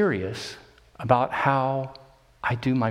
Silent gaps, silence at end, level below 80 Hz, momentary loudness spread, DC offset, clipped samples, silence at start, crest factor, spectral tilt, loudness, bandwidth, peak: none; 0 s; -56 dBFS; 15 LU; under 0.1%; under 0.1%; 0 s; 22 dB; -7 dB/octave; -25 LUFS; 12.5 kHz; -4 dBFS